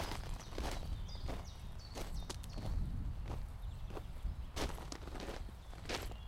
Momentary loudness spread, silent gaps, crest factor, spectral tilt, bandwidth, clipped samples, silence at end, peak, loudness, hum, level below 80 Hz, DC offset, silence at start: 6 LU; none; 18 dB; -4.5 dB/octave; 16 kHz; under 0.1%; 0 s; -24 dBFS; -46 LUFS; none; -44 dBFS; under 0.1%; 0 s